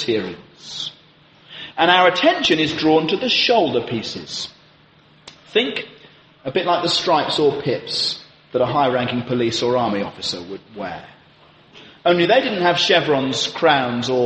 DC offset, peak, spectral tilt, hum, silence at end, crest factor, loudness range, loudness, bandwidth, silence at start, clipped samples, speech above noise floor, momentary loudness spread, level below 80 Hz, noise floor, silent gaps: under 0.1%; -2 dBFS; -4 dB/octave; none; 0 s; 18 dB; 6 LU; -18 LUFS; 8.8 kHz; 0 s; under 0.1%; 33 dB; 16 LU; -60 dBFS; -52 dBFS; none